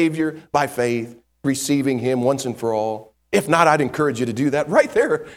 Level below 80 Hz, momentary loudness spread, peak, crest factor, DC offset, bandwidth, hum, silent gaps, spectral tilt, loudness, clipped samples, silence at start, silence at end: -58 dBFS; 9 LU; 0 dBFS; 20 dB; under 0.1%; 17 kHz; none; none; -5 dB/octave; -20 LUFS; under 0.1%; 0 s; 0 s